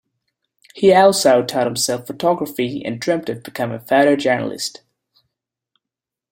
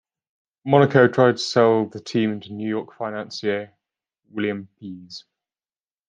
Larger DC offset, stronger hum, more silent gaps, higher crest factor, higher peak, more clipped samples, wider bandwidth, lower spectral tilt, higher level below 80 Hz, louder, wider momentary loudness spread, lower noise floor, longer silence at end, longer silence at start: neither; neither; neither; about the same, 18 dB vs 20 dB; about the same, -2 dBFS vs -2 dBFS; neither; first, 16.5 kHz vs 9.4 kHz; second, -4 dB/octave vs -6 dB/octave; first, -62 dBFS vs -68 dBFS; first, -17 LUFS vs -21 LUFS; second, 13 LU vs 22 LU; second, -86 dBFS vs under -90 dBFS; first, 1.6 s vs 0.9 s; about the same, 0.75 s vs 0.65 s